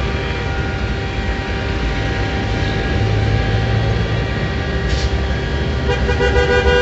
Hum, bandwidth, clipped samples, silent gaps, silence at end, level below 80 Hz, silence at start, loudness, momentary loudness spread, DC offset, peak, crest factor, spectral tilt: none; 8 kHz; under 0.1%; none; 0 s; -22 dBFS; 0 s; -18 LUFS; 6 LU; under 0.1%; -2 dBFS; 16 dB; -6 dB/octave